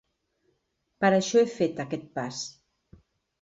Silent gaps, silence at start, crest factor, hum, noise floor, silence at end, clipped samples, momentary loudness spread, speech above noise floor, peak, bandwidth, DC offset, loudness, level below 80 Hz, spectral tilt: none; 1 s; 20 dB; none; -76 dBFS; 0.9 s; under 0.1%; 13 LU; 50 dB; -10 dBFS; 8 kHz; under 0.1%; -26 LUFS; -68 dBFS; -4.5 dB/octave